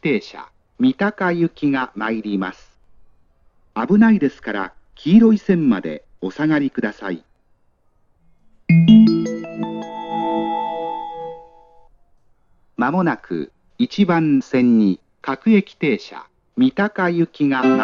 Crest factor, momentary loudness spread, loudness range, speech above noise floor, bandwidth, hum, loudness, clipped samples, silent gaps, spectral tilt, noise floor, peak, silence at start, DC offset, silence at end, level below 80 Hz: 18 dB; 17 LU; 8 LU; 41 dB; 6.8 kHz; none; -18 LUFS; under 0.1%; none; -8 dB/octave; -59 dBFS; -2 dBFS; 0.05 s; under 0.1%; 0 s; -56 dBFS